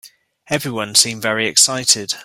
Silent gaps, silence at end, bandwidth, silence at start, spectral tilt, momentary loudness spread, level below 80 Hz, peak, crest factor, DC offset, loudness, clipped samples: none; 0 s; over 20 kHz; 0.05 s; -1 dB/octave; 10 LU; -58 dBFS; 0 dBFS; 18 dB; under 0.1%; -15 LUFS; under 0.1%